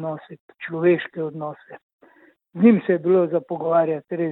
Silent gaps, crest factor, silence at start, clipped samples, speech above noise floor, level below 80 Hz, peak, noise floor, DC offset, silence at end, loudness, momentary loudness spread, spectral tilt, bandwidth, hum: 0.40-0.48 s, 1.83-1.99 s; 18 dB; 0 s; under 0.1%; 35 dB; -70 dBFS; -2 dBFS; -55 dBFS; under 0.1%; 0 s; -21 LUFS; 19 LU; -11.5 dB/octave; 4.1 kHz; none